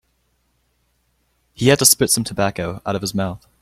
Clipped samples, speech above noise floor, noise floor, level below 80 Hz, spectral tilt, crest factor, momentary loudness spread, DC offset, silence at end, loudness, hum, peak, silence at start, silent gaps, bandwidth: under 0.1%; 47 dB; -66 dBFS; -50 dBFS; -3 dB/octave; 20 dB; 13 LU; under 0.1%; 0.25 s; -17 LUFS; none; 0 dBFS; 1.6 s; none; 16.5 kHz